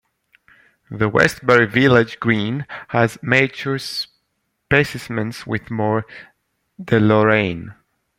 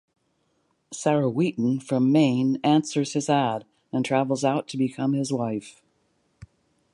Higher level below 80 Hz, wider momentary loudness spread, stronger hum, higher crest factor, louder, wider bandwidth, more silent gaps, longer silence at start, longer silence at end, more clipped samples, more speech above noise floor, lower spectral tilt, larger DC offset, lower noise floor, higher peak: first, -52 dBFS vs -66 dBFS; first, 13 LU vs 9 LU; neither; about the same, 18 dB vs 18 dB; first, -18 LUFS vs -24 LUFS; first, 16.5 kHz vs 11.5 kHz; neither; about the same, 0.9 s vs 0.9 s; about the same, 0.45 s vs 0.5 s; neither; first, 54 dB vs 47 dB; about the same, -6 dB/octave vs -6 dB/octave; neither; about the same, -72 dBFS vs -70 dBFS; first, 0 dBFS vs -8 dBFS